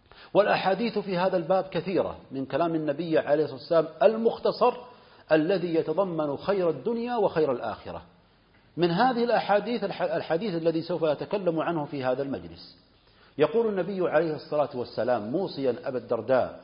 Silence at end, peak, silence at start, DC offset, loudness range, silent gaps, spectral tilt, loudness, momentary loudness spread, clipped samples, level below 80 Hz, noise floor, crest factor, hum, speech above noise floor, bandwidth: 0 s; -6 dBFS; 0.2 s; under 0.1%; 3 LU; none; -10.5 dB/octave; -27 LUFS; 8 LU; under 0.1%; -64 dBFS; -60 dBFS; 20 dB; none; 34 dB; 5.4 kHz